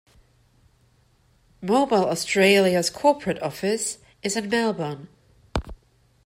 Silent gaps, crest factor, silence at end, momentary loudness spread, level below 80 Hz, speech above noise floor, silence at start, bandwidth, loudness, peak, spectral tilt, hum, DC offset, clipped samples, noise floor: none; 18 dB; 0.5 s; 15 LU; -46 dBFS; 39 dB; 1.6 s; 16 kHz; -23 LUFS; -6 dBFS; -4 dB/octave; none; under 0.1%; under 0.1%; -61 dBFS